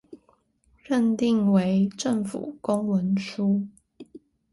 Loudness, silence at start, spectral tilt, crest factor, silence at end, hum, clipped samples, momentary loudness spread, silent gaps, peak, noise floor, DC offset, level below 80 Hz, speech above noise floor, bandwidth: -25 LUFS; 0.1 s; -7 dB/octave; 16 dB; 0.35 s; none; under 0.1%; 7 LU; none; -10 dBFS; -64 dBFS; under 0.1%; -64 dBFS; 41 dB; 11.5 kHz